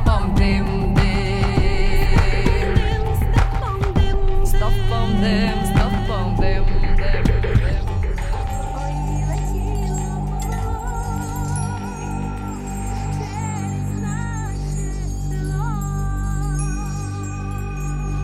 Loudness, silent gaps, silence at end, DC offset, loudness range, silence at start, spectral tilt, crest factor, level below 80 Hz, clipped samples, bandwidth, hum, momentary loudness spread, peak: -22 LUFS; none; 0 s; under 0.1%; 6 LU; 0 s; -6 dB/octave; 16 dB; -20 dBFS; under 0.1%; 15 kHz; 50 Hz at -40 dBFS; 8 LU; -2 dBFS